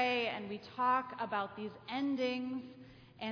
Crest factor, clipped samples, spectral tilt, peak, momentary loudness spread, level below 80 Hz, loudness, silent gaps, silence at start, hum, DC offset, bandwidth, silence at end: 18 dB; under 0.1%; -5.5 dB/octave; -20 dBFS; 13 LU; -76 dBFS; -37 LUFS; none; 0 s; none; under 0.1%; 5.4 kHz; 0 s